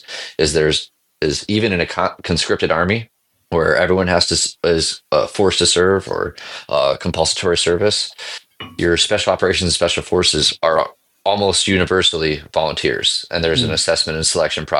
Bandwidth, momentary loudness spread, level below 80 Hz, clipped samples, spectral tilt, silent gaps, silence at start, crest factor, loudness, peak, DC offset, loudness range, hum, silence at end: 12 kHz; 8 LU; -42 dBFS; under 0.1%; -3 dB/octave; none; 0.1 s; 16 dB; -16 LUFS; 0 dBFS; under 0.1%; 2 LU; none; 0 s